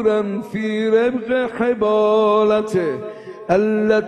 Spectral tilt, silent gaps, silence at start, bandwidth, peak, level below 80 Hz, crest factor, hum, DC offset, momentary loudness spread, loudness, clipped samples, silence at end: -6.5 dB/octave; none; 0 s; 9.8 kHz; -2 dBFS; -54 dBFS; 14 dB; none; under 0.1%; 9 LU; -18 LUFS; under 0.1%; 0 s